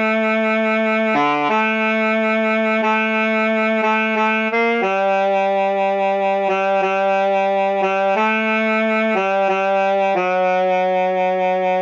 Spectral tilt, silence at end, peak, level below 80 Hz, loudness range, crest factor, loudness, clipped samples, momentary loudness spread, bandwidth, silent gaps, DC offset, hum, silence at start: -6 dB/octave; 0 s; -6 dBFS; -76 dBFS; 1 LU; 10 dB; -17 LUFS; under 0.1%; 1 LU; 7.6 kHz; none; under 0.1%; none; 0 s